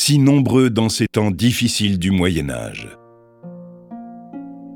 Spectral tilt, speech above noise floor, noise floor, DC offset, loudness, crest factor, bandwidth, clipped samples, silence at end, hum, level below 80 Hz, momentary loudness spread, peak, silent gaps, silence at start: -5 dB/octave; 24 dB; -41 dBFS; under 0.1%; -17 LUFS; 16 dB; 18 kHz; under 0.1%; 0 s; none; -44 dBFS; 24 LU; -2 dBFS; none; 0 s